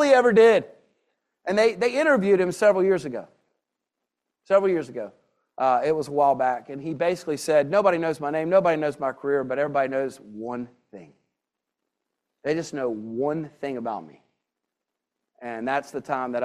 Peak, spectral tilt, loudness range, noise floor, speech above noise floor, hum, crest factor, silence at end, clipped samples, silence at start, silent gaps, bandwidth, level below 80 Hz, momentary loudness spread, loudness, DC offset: -4 dBFS; -5.5 dB/octave; 9 LU; -85 dBFS; 62 dB; none; 20 dB; 0 s; under 0.1%; 0 s; none; 13 kHz; -70 dBFS; 15 LU; -23 LUFS; under 0.1%